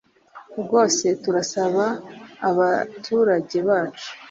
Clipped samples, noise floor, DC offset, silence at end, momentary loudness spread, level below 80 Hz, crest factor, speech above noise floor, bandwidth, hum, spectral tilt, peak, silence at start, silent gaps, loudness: under 0.1%; -47 dBFS; under 0.1%; 0 s; 14 LU; -68 dBFS; 18 dB; 26 dB; 7.8 kHz; none; -4 dB/octave; -4 dBFS; 0.35 s; none; -21 LUFS